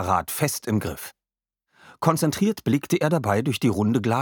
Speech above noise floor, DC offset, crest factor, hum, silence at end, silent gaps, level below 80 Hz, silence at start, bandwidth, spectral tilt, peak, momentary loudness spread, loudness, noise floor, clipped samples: 66 dB; under 0.1%; 20 dB; none; 0 s; none; -54 dBFS; 0 s; 19 kHz; -5.5 dB/octave; -4 dBFS; 5 LU; -23 LUFS; -89 dBFS; under 0.1%